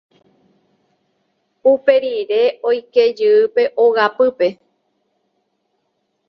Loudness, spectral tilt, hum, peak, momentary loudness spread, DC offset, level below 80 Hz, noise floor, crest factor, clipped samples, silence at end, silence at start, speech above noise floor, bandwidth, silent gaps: -15 LUFS; -5.5 dB/octave; none; 0 dBFS; 6 LU; under 0.1%; -68 dBFS; -69 dBFS; 18 dB; under 0.1%; 1.75 s; 1.65 s; 55 dB; 6 kHz; none